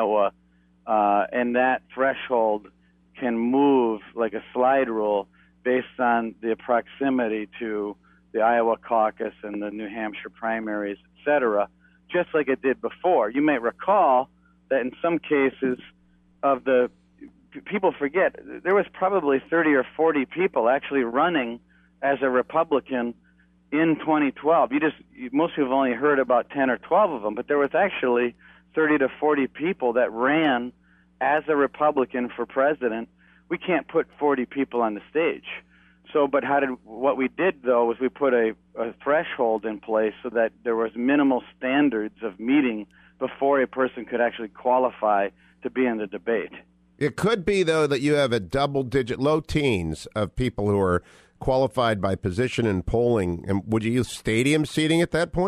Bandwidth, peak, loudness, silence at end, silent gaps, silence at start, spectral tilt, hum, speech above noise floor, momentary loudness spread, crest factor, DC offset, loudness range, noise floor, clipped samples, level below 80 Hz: 13 kHz; -8 dBFS; -24 LUFS; 0 s; none; 0 s; -6.5 dB/octave; none; 26 dB; 10 LU; 16 dB; under 0.1%; 3 LU; -49 dBFS; under 0.1%; -50 dBFS